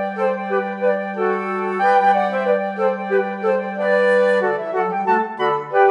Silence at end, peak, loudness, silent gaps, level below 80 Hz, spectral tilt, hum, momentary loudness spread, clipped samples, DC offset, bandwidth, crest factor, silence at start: 0 s; -2 dBFS; -19 LUFS; none; -88 dBFS; -6.5 dB/octave; none; 6 LU; under 0.1%; under 0.1%; 10 kHz; 16 dB; 0 s